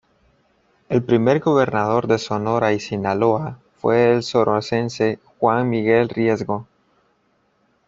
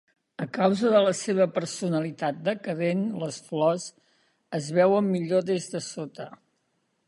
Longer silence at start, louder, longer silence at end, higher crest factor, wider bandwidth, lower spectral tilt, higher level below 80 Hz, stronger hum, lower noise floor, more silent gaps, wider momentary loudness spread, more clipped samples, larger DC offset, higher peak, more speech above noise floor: first, 0.9 s vs 0.4 s; first, -19 LUFS vs -26 LUFS; first, 1.25 s vs 0.75 s; about the same, 18 dB vs 18 dB; second, 7.8 kHz vs 11.5 kHz; about the same, -6.5 dB/octave vs -5.5 dB/octave; first, -58 dBFS vs -74 dBFS; neither; second, -64 dBFS vs -74 dBFS; neither; second, 7 LU vs 15 LU; neither; neither; first, -2 dBFS vs -8 dBFS; about the same, 45 dB vs 48 dB